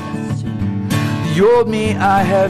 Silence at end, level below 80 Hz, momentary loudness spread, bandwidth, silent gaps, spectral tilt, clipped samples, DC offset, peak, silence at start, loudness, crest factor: 0 s; -40 dBFS; 10 LU; 13 kHz; none; -6.5 dB/octave; under 0.1%; under 0.1%; -6 dBFS; 0 s; -16 LUFS; 10 dB